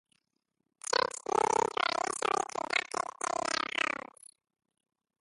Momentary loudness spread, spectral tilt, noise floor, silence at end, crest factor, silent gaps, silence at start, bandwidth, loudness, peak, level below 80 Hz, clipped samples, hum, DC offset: 7 LU; -1 dB/octave; -82 dBFS; 1.35 s; 22 dB; none; 0.9 s; 11.5 kHz; -32 LUFS; -14 dBFS; -72 dBFS; under 0.1%; none; under 0.1%